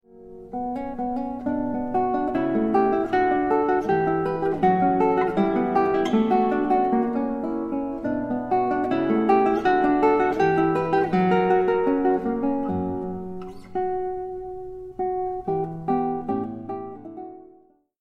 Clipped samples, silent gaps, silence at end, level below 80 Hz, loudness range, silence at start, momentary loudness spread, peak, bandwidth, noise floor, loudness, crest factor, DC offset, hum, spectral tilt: under 0.1%; none; 0.6 s; -50 dBFS; 8 LU; 0.15 s; 13 LU; -8 dBFS; 6.8 kHz; -56 dBFS; -23 LUFS; 16 dB; under 0.1%; none; -8.5 dB/octave